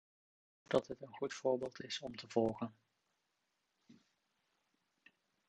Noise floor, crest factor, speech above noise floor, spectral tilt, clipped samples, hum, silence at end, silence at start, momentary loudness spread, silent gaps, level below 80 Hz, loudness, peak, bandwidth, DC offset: -85 dBFS; 26 dB; 45 dB; -5 dB/octave; under 0.1%; none; 1.55 s; 0.7 s; 9 LU; none; -76 dBFS; -40 LUFS; -18 dBFS; 9 kHz; under 0.1%